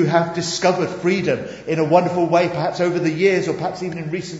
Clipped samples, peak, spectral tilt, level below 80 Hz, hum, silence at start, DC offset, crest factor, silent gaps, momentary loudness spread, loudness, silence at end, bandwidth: under 0.1%; -2 dBFS; -5.5 dB/octave; -56 dBFS; none; 0 s; under 0.1%; 18 dB; none; 9 LU; -19 LUFS; 0 s; 8 kHz